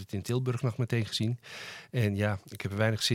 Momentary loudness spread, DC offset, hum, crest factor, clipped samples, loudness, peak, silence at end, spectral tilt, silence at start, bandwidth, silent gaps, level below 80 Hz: 9 LU; under 0.1%; none; 20 dB; under 0.1%; -31 LUFS; -12 dBFS; 0 s; -5.5 dB/octave; 0 s; 16 kHz; none; -68 dBFS